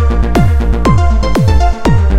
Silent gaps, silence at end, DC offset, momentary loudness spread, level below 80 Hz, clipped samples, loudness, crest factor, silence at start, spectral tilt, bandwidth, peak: none; 0 s; 10%; 1 LU; -12 dBFS; under 0.1%; -11 LUFS; 10 dB; 0 s; -7.5 dB/octave; 11.5 kHz; 0 dBFS